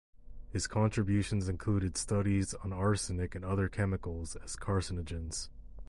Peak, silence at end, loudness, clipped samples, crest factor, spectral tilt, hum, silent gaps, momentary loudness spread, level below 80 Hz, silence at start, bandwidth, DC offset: -18 dBFS; 0 s; -34 LUFS; under 0.1%; 14 dB; -5.5 dB/octave; none; none; 10 LU; -46 dBFS; 0.15 s; 11.5 kHz; under 0.1%